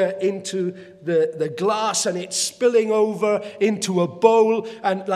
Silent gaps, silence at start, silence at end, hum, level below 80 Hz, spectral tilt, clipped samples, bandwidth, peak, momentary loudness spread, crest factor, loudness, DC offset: none; 0 s; 0 s; none; -74 dBFS; -4 dB/octave; under 0.1%; 14 kHz; -2 dBFS; 8 LU; 20 dB; -21 LUFS; under 0.1%